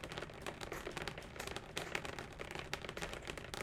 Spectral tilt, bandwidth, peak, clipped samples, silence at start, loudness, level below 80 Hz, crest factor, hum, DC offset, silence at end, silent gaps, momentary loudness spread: -3.5 dB/octave; 17.5 kHz; -18 dBFS; under 0.1%; 0 s; -45 LUFS; -58 dBFS; 28 dB; none; under 0.1%; 0 s; none; 4 LU